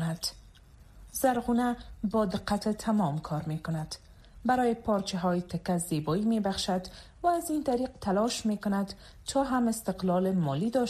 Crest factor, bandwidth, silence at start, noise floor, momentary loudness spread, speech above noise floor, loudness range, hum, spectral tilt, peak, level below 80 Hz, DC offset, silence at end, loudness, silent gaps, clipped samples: 16 dB; 15 kHz; 0 s; -54 dBFS; 8 LU; 25 dB; 1 LU; none; -5.5 dB/octave; -14 dBFS; -52 dBFS; under 0.1%; 0 s; -30 LUFS; none; under 0.1%